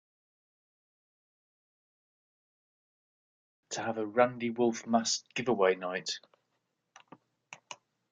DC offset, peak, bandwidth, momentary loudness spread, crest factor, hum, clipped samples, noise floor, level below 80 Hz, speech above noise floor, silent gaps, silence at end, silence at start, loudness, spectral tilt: under 0.1%; -10 dBFS; 9.6 kHz; 19 LU; 26 dB; none; under 0.1%; -81 dBFS; -80 dBFS; 51 dB; none; 0.4 s; 3.7 s; -31 LUFS; -3.5 dB/octave